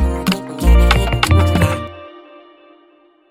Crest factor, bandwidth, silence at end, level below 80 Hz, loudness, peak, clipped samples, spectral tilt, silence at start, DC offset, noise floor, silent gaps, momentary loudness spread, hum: 14 dB; 15.5 kHz; 1.2 s; -18 dBFS; -15 LUFS; 0 dBFS; under 0.1%; -5.5 dB/octave; 0 s; under 0.1%; -51 dBFS; none; 13 LU; none